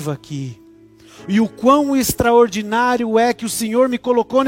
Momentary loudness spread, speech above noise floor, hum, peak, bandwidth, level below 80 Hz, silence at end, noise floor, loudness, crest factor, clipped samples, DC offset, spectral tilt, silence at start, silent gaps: 14 LU; 29 dB; none; -2 dBFS; 16.5 kHz; -46 dBFS; 0 s; -45 dBFS; -16 LUFS; 16 dB; under 0.1%; under 0.1%; -5 dB/octave; 0 s; none